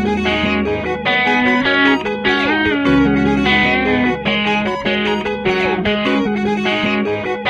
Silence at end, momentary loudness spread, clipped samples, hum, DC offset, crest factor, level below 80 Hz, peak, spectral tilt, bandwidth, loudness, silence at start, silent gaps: 0 s; 5 LU; under 0.1%; none; under 0.1%; 14 dB; -38 dBFS; 0 dBFS; -6 dB/octave; 9.4 kHz; -15 LUFS; 0 s; none